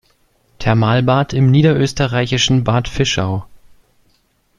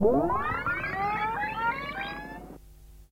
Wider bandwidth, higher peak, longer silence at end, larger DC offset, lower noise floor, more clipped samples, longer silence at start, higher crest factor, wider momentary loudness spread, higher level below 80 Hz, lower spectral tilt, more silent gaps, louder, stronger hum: second, 10.5 kHz vs 16 kHz; first, 0 dBFS vs -12 dBFS; first, 1.05 s vs 0.1 s; neither; first, -59 dBFS vs -51 dBFS; neither; first, 0.6 s vs 0 s; about the same, 16 dB vs 18 dB; second, 7 LU vs 15 LU; first, -38 dBFS vs -48 dBFS; second, -5.5 dB/octave vs -7 dB/octave; neither; first, -15 LUFS vs -29 LUFS; neither